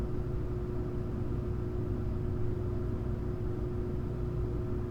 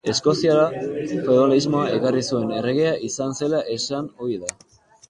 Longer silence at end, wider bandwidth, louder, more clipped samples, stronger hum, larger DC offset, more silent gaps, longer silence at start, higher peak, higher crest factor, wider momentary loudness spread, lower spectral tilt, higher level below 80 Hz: second, 0 s vs 0.6 s; second, 6.8 kHz vs 11.5 kHz; second, -36 LUFS vs -21 LUFS; neither; first, 60 Hz at -40 dBFS vs none; neither; neither; about the same, 0 s vs 0.05 s; second, -22 dBFS vs -2 dBFS; second, 12 dB vs 18 dB; second, 1 LU vs 10 LU; first, -10 dB/octave vs -5 dB/octave; first, -38 dBFS vs -60 dBFS